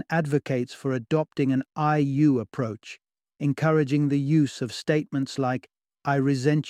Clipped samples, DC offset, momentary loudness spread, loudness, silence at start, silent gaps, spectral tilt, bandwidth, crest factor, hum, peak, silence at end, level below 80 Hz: under 0.1%; under 0.1%; 9 LU; -25 LUFS; 0.1 s; none; -7.5 dB/octave; 11 kHz; 16 dB; none; -8 dBFS; 0 s; -66 dBFS